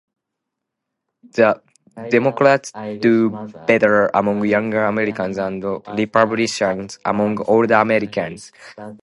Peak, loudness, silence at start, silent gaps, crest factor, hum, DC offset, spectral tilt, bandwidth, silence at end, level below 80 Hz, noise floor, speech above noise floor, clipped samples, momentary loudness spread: 0 dBFS; -18 LUFS; 1.35 s; none; 18 dB; none; under 0.1%; -5.5 dB/octave; 11.5 kHz; 0.05 s; -58 dBFS; -80 dBFS; 62 dB; under 0.1%; 13 LU